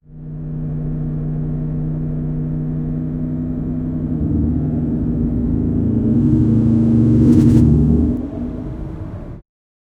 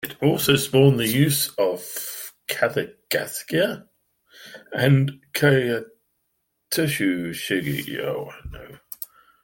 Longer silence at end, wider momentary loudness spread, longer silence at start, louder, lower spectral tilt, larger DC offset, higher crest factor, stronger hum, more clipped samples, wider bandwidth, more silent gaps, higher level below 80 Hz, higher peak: first, 0.6 s vs 0.4 s; second, 15 LU vs 19 LU; about the same, 0.1 s vs 0 s; first, -17 LUFS vs -22 LUFS; first, -11 dB/octave vs -5 dB/octave; neither; second, 16 dB vs 22 dB; neither; neither; second, 6.8 kHz vs 17 kHz; neither; first, -28 dBFS vs -54 dBFS; about the same, 0 dBFS vs -2 dBFS